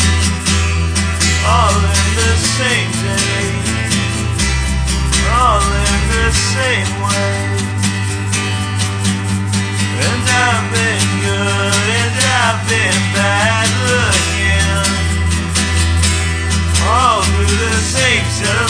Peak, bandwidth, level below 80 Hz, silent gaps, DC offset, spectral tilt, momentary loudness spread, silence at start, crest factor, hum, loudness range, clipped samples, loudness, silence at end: 0 dBFS; 11 kHz; -22 dBFS; none; under 0.1%; -3.5 dB/octave; 5 LU; 0 s; 14 dB; none; 3 LU; under 0.1%; -14 LUFS; 0 s